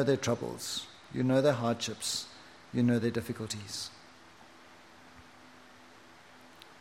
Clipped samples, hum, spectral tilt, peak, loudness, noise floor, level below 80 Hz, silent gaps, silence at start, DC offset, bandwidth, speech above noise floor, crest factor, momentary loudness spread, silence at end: under 0.1%; none; -5 dB/octave; -14 dBFS; -32 LUFS; -56 dBFS; -70 dBFS; none; 0 s; under 0.1%; 16 kHz; 25 dB; 20 dB; 26 LU; 0.1 s